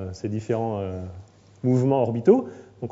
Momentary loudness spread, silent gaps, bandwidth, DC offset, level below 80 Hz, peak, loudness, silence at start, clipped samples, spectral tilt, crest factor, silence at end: 17 LU; none; 7.8 kHz; under 0.1%; -60 dBFS; -4 dBFS; -23 LUFS; 0 s; under 0.1%; -9 dB/octave; 20 dB; 0 s